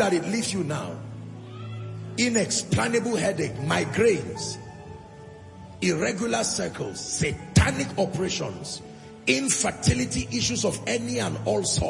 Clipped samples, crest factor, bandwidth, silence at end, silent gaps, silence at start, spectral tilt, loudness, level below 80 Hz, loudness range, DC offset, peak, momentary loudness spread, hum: under 0.1%; 22 dB; 11.5 kHz; 0 s; none; 0 s; -4 dB/octave; -25 LUFS; -46 dBFS; 2 LU; under 0.1%; -4 dBFS; 17 LU; none